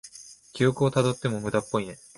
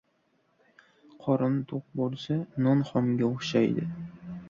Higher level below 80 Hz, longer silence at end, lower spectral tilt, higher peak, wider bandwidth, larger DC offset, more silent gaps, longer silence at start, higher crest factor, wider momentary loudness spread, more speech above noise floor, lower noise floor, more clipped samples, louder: first, -58 dBFS vs -66 dBFS; first, 0.2 s vs 0 s; second, -6 dB/octave vs -7.5 dB/octave; about the same, -8 dBFS vs -10 dBFS; first, 11.5 kHz vs 7.4 kHz; neither; neither; second, 0.05 s vs 1.2 s; about the same, 18 dB vs 18 dB; first, 20 LU vs 11 LU; second, 23 dB vs 43 dB; second, -48 dBFS vs -71 dBFS; neither; about the same, -26 LUFS vs -28 LUFS